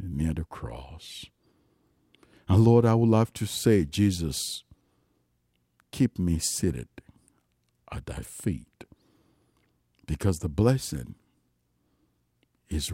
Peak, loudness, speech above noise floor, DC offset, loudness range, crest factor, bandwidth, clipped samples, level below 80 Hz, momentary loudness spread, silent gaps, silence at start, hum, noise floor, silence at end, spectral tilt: -8 dBFS; -26 LUFS; 47 dB; under 0.1%; 11 LU; 20 dB; 16 kHz; under 0.1%; -46 dBFS; 20 LU; none; 0 s; 60 Hz at -55 dBFS; -73 dBFS; 0 s; -6 dB/octave